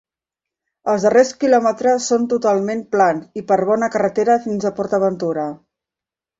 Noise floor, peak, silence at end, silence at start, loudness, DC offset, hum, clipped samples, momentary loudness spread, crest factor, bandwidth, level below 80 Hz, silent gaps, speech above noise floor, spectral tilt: -88 dBFS; -2 dBFS; 0.85 s; 0.85 s; -17 LUFS; under 0.1%; none; under 0.1%; 8 LU; 16 dB; 8 kHz; -62 dBFS; none; 71 dB; -5 dB/octave